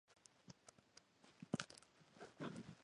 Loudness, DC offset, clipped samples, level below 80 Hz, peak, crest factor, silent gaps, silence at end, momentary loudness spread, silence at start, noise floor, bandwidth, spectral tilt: -53 LUFS; under 0.1%; under 0.1%; -84 dBFS; -24 dBFS; 32 dB; none; 0 s; 20 LU; 0.1 s; -71 dBFS; 11 kHz; -4.5 dB/octave